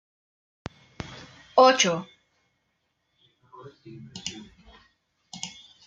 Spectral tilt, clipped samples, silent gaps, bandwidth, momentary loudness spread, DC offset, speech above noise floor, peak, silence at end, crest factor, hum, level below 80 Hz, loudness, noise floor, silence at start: -2.5 dB/octave; under 0.1%; none; 9.4 kHz; 28 LU; under 0.1%; 53 dB; -6 dBFS; 0.35 s; 24 dB; none; -62 dBFS; -22 LUFS; -75 dBFS; 1.1 s